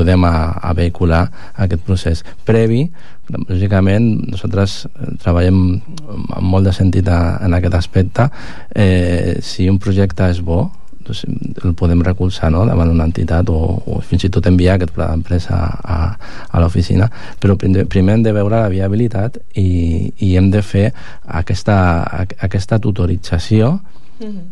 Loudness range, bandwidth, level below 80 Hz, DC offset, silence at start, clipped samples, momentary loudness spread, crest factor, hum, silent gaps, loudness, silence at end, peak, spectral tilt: 2 LU; 10.5 kHz; -26 dBFS; 9%; 0 s; under 0.1%; 10 LU; 12 dB; none; none; -15 LUFS; 0 s; 0 dBFS; -8 dB/octave